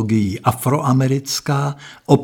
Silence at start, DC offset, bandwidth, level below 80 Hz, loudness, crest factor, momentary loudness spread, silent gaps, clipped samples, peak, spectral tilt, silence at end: 0 s; under 0.1%; 18 kHz; -50 dBFS; -18 LUFS; 18 dB; 5 LU; none; under 0.1%; 0 dBFS; -6 dB/octave; 0 s